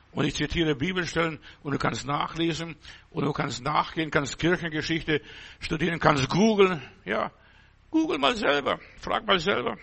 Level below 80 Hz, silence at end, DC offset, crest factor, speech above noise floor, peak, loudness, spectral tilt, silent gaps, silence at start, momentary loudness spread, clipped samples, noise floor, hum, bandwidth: -48 dBFS; 0 s; under 0.1%; 22 dB; 28 dB; -4 dBFS; -26 LUFS; -5 dB/octave; none; 0.15 s; 10 LU; under 0.1%; -55 dBFS; none; 8.4 kHz